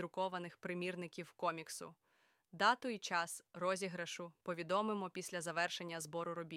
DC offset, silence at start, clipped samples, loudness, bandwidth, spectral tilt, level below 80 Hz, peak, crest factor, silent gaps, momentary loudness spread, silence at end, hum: under 0.1%; 0 s; under 0.1%; -41 LUFS; 16.5 kHz; -3.5 dB/octave; -88 dBFS; -20 dBFS; 22 dB; none; 11 LU; 0 s; none